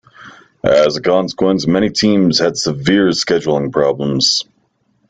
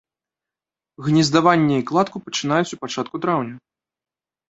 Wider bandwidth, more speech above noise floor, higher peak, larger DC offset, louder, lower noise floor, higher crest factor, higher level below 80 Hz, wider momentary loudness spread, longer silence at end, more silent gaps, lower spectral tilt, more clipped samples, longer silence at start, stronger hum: first, 9.4 kHz vs 8.2 kHz; second, 47 dB vs over 71 dB; about the same, 0 dBFS vs -2 dBFS; neither; first, -14 LUFS vs -20 LUFS; second, -61 dBFS vs under -90 dBFS; second, 14 dB vs 20 dB; first, -48 dBFS vs -62 dBFS; second, 4 LU vs 12 LU; second, 0.65 s vs 0.9 s; neither; about the same, -4.5 dB/octave vs -5.5 dB/octave; neither; second, 0.2 s vs 1 s; neither